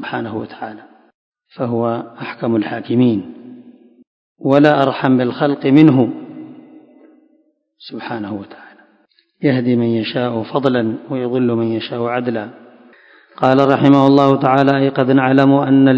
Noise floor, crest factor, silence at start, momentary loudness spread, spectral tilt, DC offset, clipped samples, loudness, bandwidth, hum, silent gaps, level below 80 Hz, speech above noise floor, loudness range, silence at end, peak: -59 dBFS; 16 dB; 0 s; 18 LU; -9 dB/octave; under 0.1%; 0.2%; -15 LUFS; 6.2 kHz; none; 1.14-1.32 s, 4.07-4.35 s; -60 dBFS; 44 dB; 8 LU; 0 s; 0 dBFS